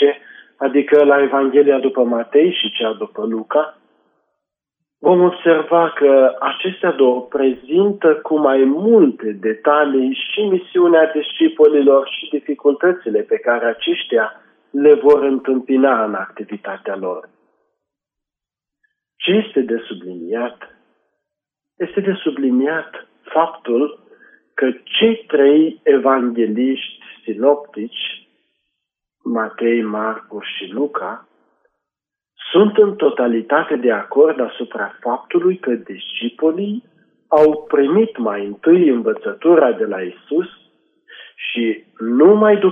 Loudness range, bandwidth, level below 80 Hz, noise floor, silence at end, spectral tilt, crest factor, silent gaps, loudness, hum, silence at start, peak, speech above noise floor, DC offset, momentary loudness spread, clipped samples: 8 LU; 3.7 kHz; -68 dBFS; -87 dBFS; 0 s; -8.5 dB/octave; 16 dB; none; -16 LUFS; none; 0 s; -2 dBFS; 71 dB; under 0.1%; 13 LU; under 0.1%